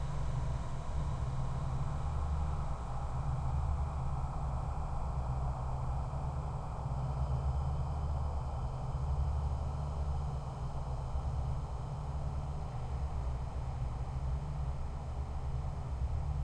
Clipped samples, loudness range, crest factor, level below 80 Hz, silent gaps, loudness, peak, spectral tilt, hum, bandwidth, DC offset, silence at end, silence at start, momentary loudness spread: under 0.1%; 3 LU; 12 dB; -38 dBFS; none; -38 LUFS; -22 dBFS; -8 dB/octave; none; 9.4 kHz; under 0.1%; 0 s; 0 s; 4 LU